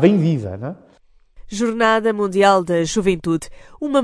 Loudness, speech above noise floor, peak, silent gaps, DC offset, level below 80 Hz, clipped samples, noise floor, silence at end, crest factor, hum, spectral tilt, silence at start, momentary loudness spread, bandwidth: -18 LUFS; 30 dB; 0 dBFS; none; under 0.1%; -46 dBFS; under 0.1%; -47 dBFS; 0 s; 18 dB; none; -6 dB/octave; 0 s; 16 LU; 11 kHz